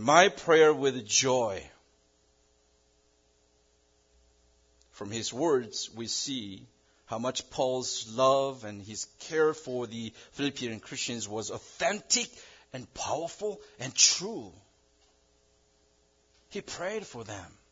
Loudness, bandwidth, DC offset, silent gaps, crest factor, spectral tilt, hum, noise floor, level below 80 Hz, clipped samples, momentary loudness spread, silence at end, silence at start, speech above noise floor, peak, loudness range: -29 LUFS; 7.8 kHz; under 0.1%; none; 26 dB; -2 dB/octave; none; -68 dBFS; -68 dBFS; under 0.1%; 20 LU; 0.25 s; 0 s; 38 dB; -6 dBFS; 8 LU